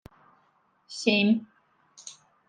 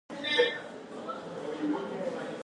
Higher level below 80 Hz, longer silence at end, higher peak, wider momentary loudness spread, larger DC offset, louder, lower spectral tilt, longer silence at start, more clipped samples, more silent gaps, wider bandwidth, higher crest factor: first, -72 dBFS vs -78 dBFS; first, 0.35 s vs 0 s; about the same, -10 dBFS vs -12 dBFS; first, 23 LU vs 13 LU; neither; first, -25 LUFS vs -32 LUFS; about the same, -4.5 dB/octave vs -4 dB/octave; first, 0.9 s vs 0.1 s; neither; neither; about the same, 9.6 kHz vs 10.5 kHz; about the same, 20 dB vs 20 dB